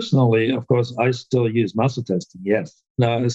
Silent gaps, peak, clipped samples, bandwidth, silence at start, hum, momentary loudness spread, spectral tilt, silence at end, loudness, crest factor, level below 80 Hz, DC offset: 2.90-2.95 s; -6 dBFS; under 0.1%; 8 kHz; 0 s; none; 8 LU; -7 dB/octave; 0 s; -21 LUFS; 14 dB; -60 dBFS; under 0.1%